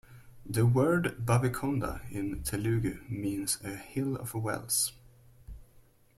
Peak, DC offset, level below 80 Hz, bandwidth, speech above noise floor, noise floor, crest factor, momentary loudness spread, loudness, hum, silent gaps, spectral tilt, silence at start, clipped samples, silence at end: -12 dBFS; under 0.1%; -50 dBFS; 15.5 kHz; 30 dB; -60 dBFS; 20 dB; 10 LU; -31 LUFS; none; none; -5 dB/octave; 0.1 s; under 0.1%; 0.55 s